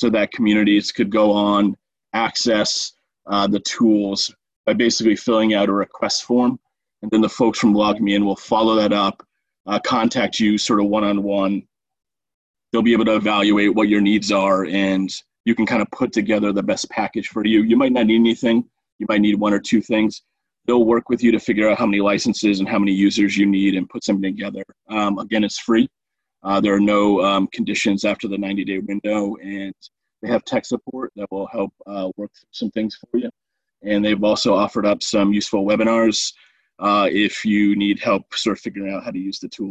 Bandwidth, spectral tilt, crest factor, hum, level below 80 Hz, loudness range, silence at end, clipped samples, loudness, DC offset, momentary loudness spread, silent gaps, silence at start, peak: 8.6 kHz; -4.5 dB/octave; 14 dB; none; -54 dBFS; 5 LU; 0 s; under 0.1%; -19 LUFS; under 0.1%; 11 LU; 4.56-4.64 s, 9.60-9.64 s, 12.34-12.54 s, 15.40-15.44 s, 18.92-18.99 s; 0 s; -4 dBFS